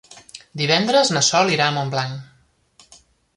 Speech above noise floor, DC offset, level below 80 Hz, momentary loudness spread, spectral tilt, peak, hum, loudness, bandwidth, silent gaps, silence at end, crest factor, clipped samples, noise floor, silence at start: 37 dB; under 0.1%; -62 dBFS; 20 LU; -3 dB/octave; -2 dBFS; none; -18 LUFS; 11.5 kHz; none; 1.1 s; 20 dB; under 0.1%; -55 dBFS; 0.1 s